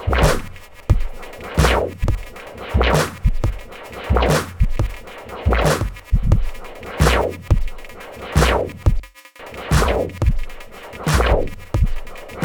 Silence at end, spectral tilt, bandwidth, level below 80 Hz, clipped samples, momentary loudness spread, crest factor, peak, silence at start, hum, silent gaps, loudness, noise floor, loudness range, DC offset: 0 s; -5.5 dB/octave; 19.5 kHz; -22 dBFS; under 0.1%; 17 LU; 18 dB; -2 dBFS; 0 s; none; none; -20 LUFS; -39 dBFS; 1 LU; 0.2%